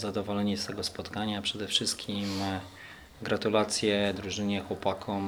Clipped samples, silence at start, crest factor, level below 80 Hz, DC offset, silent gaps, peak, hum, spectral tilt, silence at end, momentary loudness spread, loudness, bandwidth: under 0.1%; 0 s; 20 dB; -62 dBFS; under 0.1%; none; -10 dBFS; none; -4 dB/octave; 0 s; 8 LU; -30 LUFS; over 20 kHz